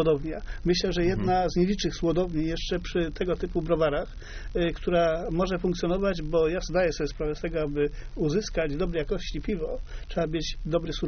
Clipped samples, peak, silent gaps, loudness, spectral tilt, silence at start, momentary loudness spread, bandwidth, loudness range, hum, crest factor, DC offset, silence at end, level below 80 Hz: under 0.1%; -12 dBFS; none; -28 LUFS; -5 dB/octave; 0 s; 7 LU; 6.6 kHz; 3 LU; none; 14 dB; under 0.1%; 0 s; -36 dBFS